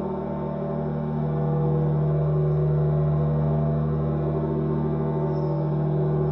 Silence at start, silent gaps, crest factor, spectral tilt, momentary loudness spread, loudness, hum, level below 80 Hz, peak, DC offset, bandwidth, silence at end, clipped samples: 0 s; none; 10 dB; -12.5 dB/octave; 5 LU; -24 LUFS; none; -40 dBFS; -12 dBFS; under 0.1%; 3.9 kHz; 0 s; under 0.1%